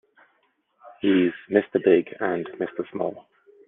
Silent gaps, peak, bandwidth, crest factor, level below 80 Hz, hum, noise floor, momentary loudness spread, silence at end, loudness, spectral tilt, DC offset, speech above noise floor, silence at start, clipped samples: none; -4 dBFS; 3.9 kHz; 20 dB; -72 dBFS; none; -68 dBFS; 11 LU; 0.5 s; -24 LUFS; -9.5 dB/octave; under 0.1%; 46 dB; 0.85 s; under 0.1%